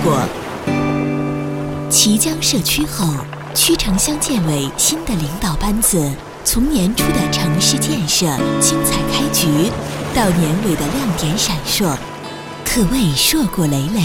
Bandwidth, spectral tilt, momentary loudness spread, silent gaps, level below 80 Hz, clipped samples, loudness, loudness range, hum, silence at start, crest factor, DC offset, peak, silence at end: 18 kHz; -3.5 dB/octave; 8 LU; none; -30 dBFS; under 0.1%; -16 LUFS; 2 LU; none; 0 s; 16 dB; under 0.1%; 0 dBFS; 0 s